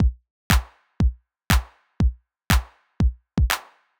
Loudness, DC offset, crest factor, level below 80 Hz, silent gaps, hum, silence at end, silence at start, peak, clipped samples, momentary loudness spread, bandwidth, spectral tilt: -24 LUFS; under 0.1%; 22 dB; -26 dBFS; 0.30-0.50 s; none; 0.4 s; 0 s; -2 dBFS; under 0.1%; 3 LU; over 20 kHz; -4.5 dB/octave